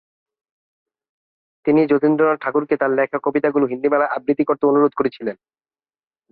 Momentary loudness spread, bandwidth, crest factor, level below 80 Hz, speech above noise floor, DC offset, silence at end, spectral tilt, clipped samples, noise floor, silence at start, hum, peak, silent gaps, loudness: 7 LU; 4.8 kHz; 16 dB; -64 dBFS; over 72 dB; under 0.1%; 0.95 s; -11 dB/octave; under 0.1%; under -90 dBFS; 1.65 s; none; -4 dBFS; none; -18 LUFS